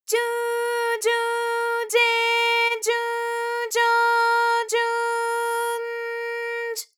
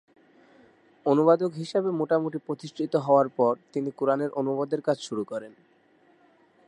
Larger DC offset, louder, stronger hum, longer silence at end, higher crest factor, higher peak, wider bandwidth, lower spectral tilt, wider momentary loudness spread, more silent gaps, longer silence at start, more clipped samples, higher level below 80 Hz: neither; first, -22 LUFS vs -26 LUFS; neither; second, 0.15 s vs 1.2 s; second, 14 dB vs 20 dB; about the same, -8 dBFS vs -8 dBFS; first, 19 kHz vs 10.5 kHz; second, 4.5 dB/octave vs -7 dB/octave; about the same, 9 LU vs 11 LU; neither; second, 0.1 s vs 1.05 s; neither; second, under -90 dBFS vs -82 dBFS